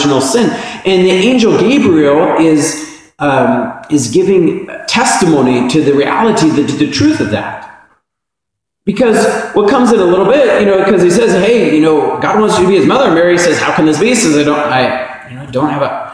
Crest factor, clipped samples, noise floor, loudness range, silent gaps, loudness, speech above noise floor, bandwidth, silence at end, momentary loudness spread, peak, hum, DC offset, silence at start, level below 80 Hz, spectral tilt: 10 dB; under 0.1%; -78 dBFS; 4 LU; none; -10 LUFS; 68 dB; 11 kHz; 0 s; 8 LU; 0 dBFS; none; under 0.1%; 0 s; -46 dBFS; -5 dB/octave